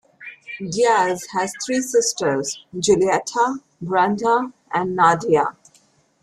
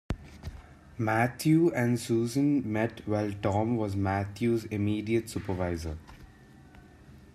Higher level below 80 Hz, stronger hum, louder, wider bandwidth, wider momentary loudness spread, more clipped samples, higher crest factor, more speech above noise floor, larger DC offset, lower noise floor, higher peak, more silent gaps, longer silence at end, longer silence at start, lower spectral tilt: second, -58 dBFS vs -52 dBFS; neither; first, -20 LUFS vs -29 LUFS; about the same, 14 kHz vs 14.5 kHz; second, 11 LU vs 15 LU; neither; about the same, 18 dB vs 18 dB; first, 39 dB vs 25 dB; neither; first, -58 dBFS vs -53 dBFS; first, -4 dBFS vs -12 dBFS; neither; first, 0.7 s vs 0.1 s; about the same, 0.2 s vs 0.1 s; second, -3.5 dB/octave vs -7 dB/octave